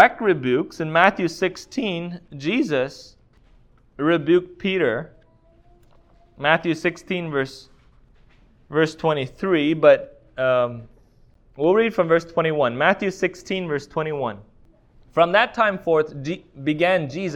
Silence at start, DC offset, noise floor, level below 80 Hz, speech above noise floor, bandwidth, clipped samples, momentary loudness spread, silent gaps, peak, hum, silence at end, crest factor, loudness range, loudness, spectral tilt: 0 s; under 0.1%; -55 dBFS; -56 dBFS; 34 dB; 10.5 kHz; under 0.1%; 11 LU; none; 0 dBFS; none; 0 s; 22 dB; 4 LU; -21 LUFS; -6 dB/octave